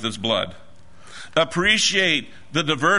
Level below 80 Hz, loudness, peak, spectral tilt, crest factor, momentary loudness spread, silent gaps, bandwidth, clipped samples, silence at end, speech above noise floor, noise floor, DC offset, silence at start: -52 dBFS; -20 LUFS; -4 dBFS; -2.5 dB/octave; 20 dB; 10 LU; none; 11 kHz; under 0.1%; 0 s; 25 dB; -46 dBFS; 1%; 0 s